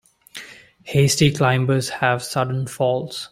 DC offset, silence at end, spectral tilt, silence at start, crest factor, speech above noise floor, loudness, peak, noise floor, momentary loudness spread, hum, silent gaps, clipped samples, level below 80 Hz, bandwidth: under 0.1%; 0.05 s; -5 dB/octave; 0.35 s; 18 dB; 21 dB; -20 LUFS; -4 dBFS; -41 dBFS; 20 LU; none; none; under 0.1%; -52 dBFS; 16 kHz